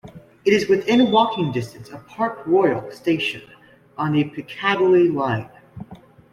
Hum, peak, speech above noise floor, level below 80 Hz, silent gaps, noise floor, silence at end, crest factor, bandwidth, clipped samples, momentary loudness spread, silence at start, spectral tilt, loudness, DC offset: none; -4 dBFS; 25 dB; -58 dBFS; none; -44 dBFS; 0.35 s; 16 dB; 12.5 kHz; under 0.1%; 23 LU; 0.05 s; -6.5 dB/octave; -20 LUFS; under 0.1%